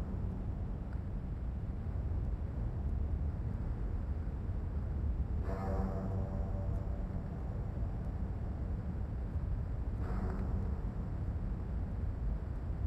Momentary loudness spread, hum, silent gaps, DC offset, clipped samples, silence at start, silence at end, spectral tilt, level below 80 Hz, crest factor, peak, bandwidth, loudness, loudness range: 3 LU; none; none; under 0.1%; under 0.1%; 0 s; 0 s; -10 dB/octave; -38 dBFS; 12 dB; -24 dBFS; 5.6 kHz; -39 LUFS; 1 LU